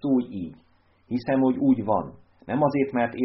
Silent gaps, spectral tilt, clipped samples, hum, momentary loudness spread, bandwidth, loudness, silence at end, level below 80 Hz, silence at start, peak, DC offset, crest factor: none; -7 dB/octave; under 0.1%; none; 14 LU; 5.6 kHz; -24 LUFS; 0 s; -60 dBFS; 0.05 s; -10 dBFS; under 0.1%; 16 dB